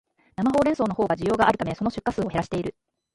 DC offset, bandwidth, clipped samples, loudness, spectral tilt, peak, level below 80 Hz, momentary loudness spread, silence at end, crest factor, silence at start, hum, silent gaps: under 0.1%; 11.5 kHz; under 0.1%; -24 LUFS; -6.5 dB/octave; -6 dBFS; -50 dBFS; 9 LU; 0.45 s; 18 dB; 0.4 s; none; none